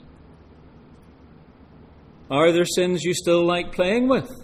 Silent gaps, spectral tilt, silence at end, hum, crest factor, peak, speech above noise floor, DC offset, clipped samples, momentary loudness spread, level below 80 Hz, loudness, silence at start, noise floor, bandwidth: none; -5 dB/octave; 0 s; none; 18 dB; -6 dBFS; 28 dB; under 0.1%; under 0.1%; 4 LU; -48 dBFS; -21 LUFS; 2.3 s; -49 dBFS; 14.5 kHz